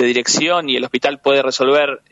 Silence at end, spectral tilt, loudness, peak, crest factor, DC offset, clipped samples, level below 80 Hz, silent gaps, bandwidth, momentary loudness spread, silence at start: 0.15 s; -2 dB/octave; -15 LUFS; -2 dBFS; 14 dB; under 0.1%; under 0.1%; -64 dBFS; none; 8 kHz; 3 LU; 0 s